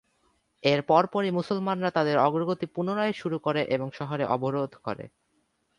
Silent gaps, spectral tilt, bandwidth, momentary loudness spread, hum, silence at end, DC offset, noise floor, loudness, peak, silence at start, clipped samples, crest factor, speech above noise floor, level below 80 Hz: none; -7 dB/octave; 11 kHz; 10 LU; none; 0.7 s; under 0.1%; -72 dBFS; -27 LUFS; -6 dBFS; 0.65 s; under 0.1%; 22 dB; 46 dB; -68 dBFS